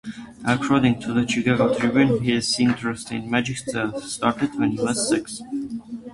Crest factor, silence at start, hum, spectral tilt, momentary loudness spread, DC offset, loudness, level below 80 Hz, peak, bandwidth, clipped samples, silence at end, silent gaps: 18 dB; 0.05 s; none; -5 dB/octave; 11 LU; under 0.1%; -22 LUFS; -52 dBFS; -4 dBFS; 11.5 kHz; under 0.1%; 0 s; none